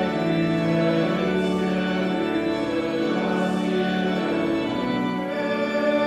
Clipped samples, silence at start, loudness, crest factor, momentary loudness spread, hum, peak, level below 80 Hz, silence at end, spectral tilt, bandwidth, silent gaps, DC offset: under 0.1%; 0 s; -23 LUFS; 12 dB; 3 LU; none; -10 dBFS; -54 dBFS; 0 s; -7 dB/octave; 12 kHz; none; under 0.1%